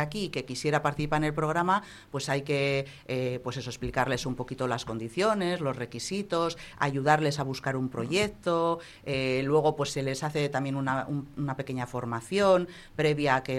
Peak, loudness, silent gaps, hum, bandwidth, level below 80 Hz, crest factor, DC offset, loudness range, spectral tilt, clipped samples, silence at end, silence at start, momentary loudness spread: -8 dBFS; -29 LUFS; none; none; 13.5 kHz; -54 dBFS; 20 dB; under 0.1%; 2 LU; -5.5 dB/octave; under 0.1%; 0 s; 0 s; 9 LU